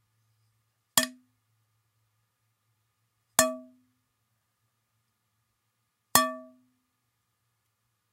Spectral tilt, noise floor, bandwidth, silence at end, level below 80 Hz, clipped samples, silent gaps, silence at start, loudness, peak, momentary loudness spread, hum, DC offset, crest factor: -1 dB/octave; -78 dBFS; 16 kHz; 1.7 s; -74 dBFS; under 0.1%; none; 0.95 s; -26 LUFS; 0 dBFS; 14 LU; none; under 0.1%; 34 dB